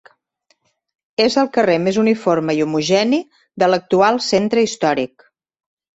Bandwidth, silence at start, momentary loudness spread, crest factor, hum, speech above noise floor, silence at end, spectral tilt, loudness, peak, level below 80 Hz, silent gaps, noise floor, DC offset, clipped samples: 8.2 kHz; 1.2 s; 6 LU; 16 dB; none; 48 dB; 0.9 s; -5 dB/octave; -17 LUFS; -2 dBFS; -60 dBFS; none; -64 dBFS; under 0.1%; under 0.1%